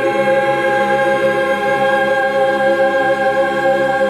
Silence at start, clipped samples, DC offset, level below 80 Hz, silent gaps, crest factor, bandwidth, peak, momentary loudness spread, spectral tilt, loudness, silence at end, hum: 0 s; under 0.1%; under 0.1%; -50 dBFS; none; 12 dB; 14 kHz; -4 dBFS; 1 LU; -5 dB/octave; -14 LUFS; 0 s; none